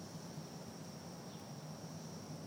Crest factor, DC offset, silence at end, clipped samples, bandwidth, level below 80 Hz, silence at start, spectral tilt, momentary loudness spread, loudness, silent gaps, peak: 14 dB; under 0.1%; 0 s; under 0.1%; 16 kHz; -78 dBFS; 0 s; -5 dB/octave; 1 LU; -50 LUFS; none; -36 dBFS